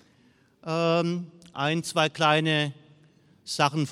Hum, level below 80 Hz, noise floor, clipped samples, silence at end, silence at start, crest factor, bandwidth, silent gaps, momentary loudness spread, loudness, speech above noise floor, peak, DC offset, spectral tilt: none; -72 dBFS; -61 dBFS; under 0.1%; 0 s; 0.65 s; 20 dB; 14 kHz; none; 14 LU; -26 LUFS; 36 dB; -6 dBFS; under 0.1%; -5 dB/octave